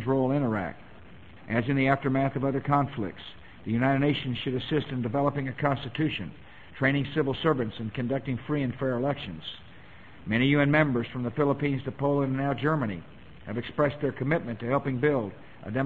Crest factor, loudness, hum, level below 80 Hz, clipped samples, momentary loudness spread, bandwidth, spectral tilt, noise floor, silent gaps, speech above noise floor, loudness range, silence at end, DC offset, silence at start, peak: 20 dB; -28 LUFS; none; -54 dBFS; under 0.1%; 13 LU; 4.5 kHz; -9 dB/octave; -50 dBFS; none; 23 dB; 3 LU; 0 s; 0.3%; 0 s; -8 dBFS